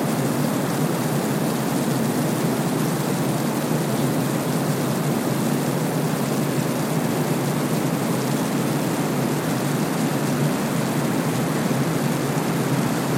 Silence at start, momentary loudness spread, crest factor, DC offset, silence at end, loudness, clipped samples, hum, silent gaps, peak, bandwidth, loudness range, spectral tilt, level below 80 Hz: 0 s; 1 LU; 14 dB; under 0.1%; 0 s; -22 LUFS; under 0.1%; none; none; -8 dBFS; 16.5 kHz; 0 LU; -5.5 dB/octave; -58 dBFS